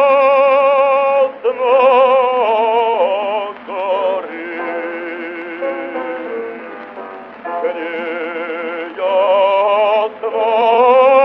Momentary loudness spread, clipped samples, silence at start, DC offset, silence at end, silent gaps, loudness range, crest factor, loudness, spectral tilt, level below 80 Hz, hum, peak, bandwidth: 15 LU; under 0.1%; 0 s; under 0.1%; 0 s; none; 11 LU; 14 dB; -15 LUFS; -5.5 dB/octave; -68 dBFS; none; -2 dBFS; 5.4 kHz